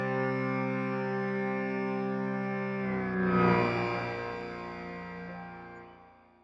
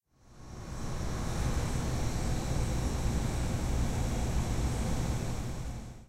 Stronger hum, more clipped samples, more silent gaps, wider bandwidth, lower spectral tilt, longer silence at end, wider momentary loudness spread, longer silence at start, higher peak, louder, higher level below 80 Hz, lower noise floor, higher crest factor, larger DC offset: neither; neither; neither; second, 7.4 kHz vs 16 kHz; first, -8.5 dB/octave vs -5.5 dB/octave; first, 0.3 s vs 0.05 s; first, 16 LU vs 8 LU; second, 0 s vs 0.3 s; first, -12 dBFS vs -18 dBFS; about the same, -32 LUFS vs -34 LUFS; second, -62 dBFS vs -36 dBFS; first, -57 dBFS vs -52 dBFS; first, 20 dB vs 14 dB; neither